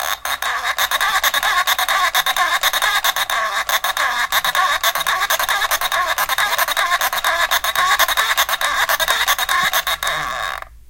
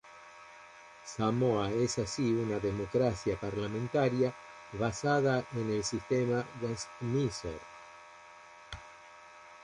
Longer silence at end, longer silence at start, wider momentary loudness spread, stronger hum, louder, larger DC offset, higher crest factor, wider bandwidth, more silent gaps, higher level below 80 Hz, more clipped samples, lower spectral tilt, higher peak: about the same, 0.1 s vs 0 s; about the same, 0 s vs 0.05 s; second, 4 LU vs 22 LU; neither; first, -16 LUFS vs -32 LUFS; neither; about the same, 16 dB vs 18 dB; first, 17.5 kHz vs 11.5 kHz; neither; first, -46 dBFS vs -58 dBFS; neither; second, 1.5 dB/octave vs -5.5 dB/octave; first, -2 dBFS vs -16 dBFS